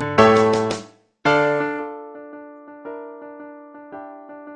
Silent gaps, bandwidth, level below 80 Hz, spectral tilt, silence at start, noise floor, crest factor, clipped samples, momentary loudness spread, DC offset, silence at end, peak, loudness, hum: none; 10 kHz; -58 dBFS; -5.5 dB/octave; 0 s; -40 dBFS; 22 dB; under 0.1%; 25 LU; under 0.1%; 0 s; 0 dBFS; -18 LUFS; none